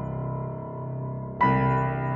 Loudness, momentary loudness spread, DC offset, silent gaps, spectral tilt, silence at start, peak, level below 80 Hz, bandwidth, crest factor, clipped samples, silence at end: -27 LUFS; 12 LU; under 0.1%; none; -10 dB/octave; 0 s; -10 dBFS; -48 dBFS; 5 kHz; 16 dB; under 0.1%; 0 s